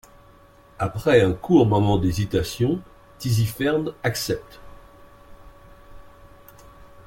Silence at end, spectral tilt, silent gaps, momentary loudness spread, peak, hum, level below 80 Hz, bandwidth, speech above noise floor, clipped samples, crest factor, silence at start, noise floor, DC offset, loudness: 0.2 s; -6.5 dB/octave; none; 11 LU; -4 dBFS; none; -46 dBFS; 17 kHz; 30 dB; under 0.1%; 20 dB; 0.8 s; -51 dBFS; under 0.1%; -22 LUFS